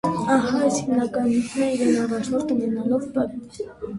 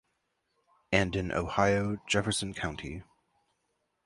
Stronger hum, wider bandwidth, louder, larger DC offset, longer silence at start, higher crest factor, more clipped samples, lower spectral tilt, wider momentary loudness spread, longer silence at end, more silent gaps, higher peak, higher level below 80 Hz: neither; about the same, 11.5 kHz vs 11.5 kHz; first, -22 LUFS vs -30 LUFS; neither; second, 0.05 s vs 0.9 s; second, 16 dB vs 24 dB; neither; about the same, -5.5 dB/octave vs -4.5 dB/octave; second, 7 LU vs 12 LU; second, 0 s vs 1.05 s; neither; about the same, -6 dBFS vs -8 dBFS; second, -56 dBFS vs -50 dBFS